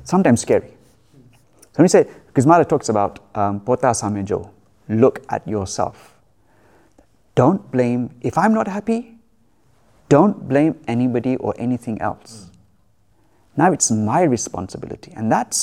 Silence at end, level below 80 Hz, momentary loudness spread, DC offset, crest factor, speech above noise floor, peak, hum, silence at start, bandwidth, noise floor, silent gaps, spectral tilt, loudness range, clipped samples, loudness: 0 s; -54 dBFS; 12 LU; 0.1%; 18 dB; 42 dB; 0 dBFS; none; 0.05 s; 15 kHz; -60 dBFS; none; -5.5 dB/octave; 5 LU; under 0.1%; -19 LUFS